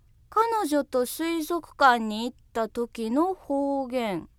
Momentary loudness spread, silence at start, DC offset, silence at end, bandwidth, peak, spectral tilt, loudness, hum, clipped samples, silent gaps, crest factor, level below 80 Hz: 10 LU; 0.3 s; under 0.1%; 0.1 s; 17.5 kHz; -6 dBFS; -4 dB/octave; -26 LUFS; none; under 0.1%; none; 22 dB; -58 dBFS